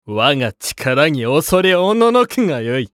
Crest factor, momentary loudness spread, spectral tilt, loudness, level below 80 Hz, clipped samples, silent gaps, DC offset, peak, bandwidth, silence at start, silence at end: 16 dB; 7 LU; -4.5 dB/octave; -15 LUFS; -48 dBFS; under 0.1%; none; under 0.1%; 0 dBFS; 17 kHz; 0.05 s; 0.05 s